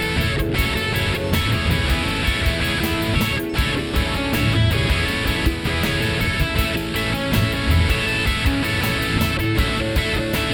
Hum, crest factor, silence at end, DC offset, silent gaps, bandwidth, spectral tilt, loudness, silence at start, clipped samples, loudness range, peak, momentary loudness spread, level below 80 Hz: none; 14 dB; 0 s; under 0.1%; none; 19 kHz; -5 dB/octave; -20 LUFS; 0 s; under 0.1%; 1 LU; -6 dBFS; 3 LU; -26 dBFS